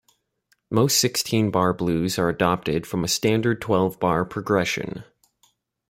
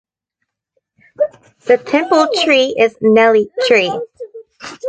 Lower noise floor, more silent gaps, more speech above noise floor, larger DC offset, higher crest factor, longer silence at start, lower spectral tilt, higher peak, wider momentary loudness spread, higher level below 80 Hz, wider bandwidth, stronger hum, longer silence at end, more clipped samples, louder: second, -68 dBFS vs -75 dBFS; neither; second, 46 dB vs 63 dB; neither; about the same, 18 dB vs 14 dB; second, 0.7 s vs 1.2 s; about the same, -4.5 dB/octave vs -4 dB/octave; second, -4 dBFS vs 0 dBFS; second, 6 LU vs 20 LU; about the same, -54 dBFS vs -58 dBFS; first, 16.5 kHz vs 9.2 kHz; neither; first, 0.85 s vs 0 s; neither; second, -22 LUFS vs -13 LUFS